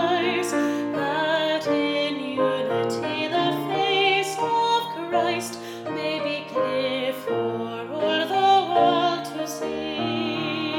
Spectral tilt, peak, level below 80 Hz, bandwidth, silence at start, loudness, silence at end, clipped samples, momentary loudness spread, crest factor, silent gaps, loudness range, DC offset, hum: -4 dB/octave; -8 dBFS; -66 dBFS; 18 kHz; 0 s; -24 LUFS; 0 s; under 0.1%; 9 LU; 16 dB; none; 3 LU; under 0.1%; none